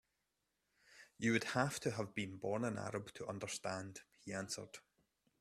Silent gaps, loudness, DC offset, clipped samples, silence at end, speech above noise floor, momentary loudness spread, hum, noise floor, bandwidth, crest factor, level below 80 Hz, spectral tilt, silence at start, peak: none; -42 LUFS; under 0.1%; under 0.1%; 0.6 s; 45 dB; 17 LU; none; -87 dBFS; 14.5 kHz; 24 dB; -76 dBFS; -4.5 dB/octave; 0.9 s; -20 dBFS